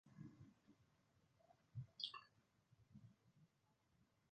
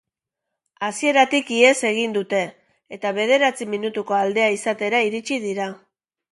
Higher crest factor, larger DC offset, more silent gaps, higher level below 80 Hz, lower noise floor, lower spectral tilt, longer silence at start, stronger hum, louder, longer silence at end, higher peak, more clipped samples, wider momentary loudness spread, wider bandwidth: first, 30 dB vs 20 dB; neither; neither; second, -86 dBFS vs -72 dBFS; about the same, -83 dBFS vs -83 dBFS; about the same, -3 dB/octave vs -3 dB/octave; second, 0.05 s vs 0.8 s; neither; second, -55 LUFS vs -20 LUFS; second, 0.05 s vs 0.55 s; second, -32 dBFS vs -2 dBFS; neither; first, 17 LU vs 12 LU; second, 7.2 kHz vs 11.5 kHz